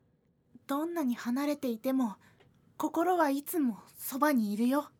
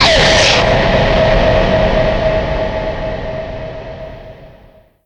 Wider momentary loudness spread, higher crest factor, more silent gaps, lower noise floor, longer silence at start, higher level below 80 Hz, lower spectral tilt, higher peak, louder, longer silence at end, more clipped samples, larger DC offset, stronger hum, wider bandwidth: second, 9 LU vs 19 LU; about the same, 18 dB vs 14 dB; neither; first, -70 dBFS vs -44 dBFS; first, 0.7 s vs 0 s; second, -80 dBFS vs -22 dBFS; about the same, -5 dB/octave vs -4 dB/octave; second, -14 dBFS vs 0 dBFS; second, -32 LUFS vs -12 LUFS; second, 0.1 s vs 0.55 s; neither; neither; neither; first, 20 kHz vs 10.5 kHz